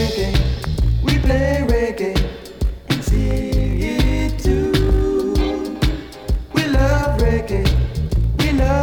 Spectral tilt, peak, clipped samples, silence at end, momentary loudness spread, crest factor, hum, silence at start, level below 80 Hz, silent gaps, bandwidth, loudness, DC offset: -6.5 dB/octave; 0 dBFS; under 0.1%; 0 s; 5 LU; 16 dB; none; 0 s; -20 dBFS; none; 17 kHz; -19 LUFS; under 0.1%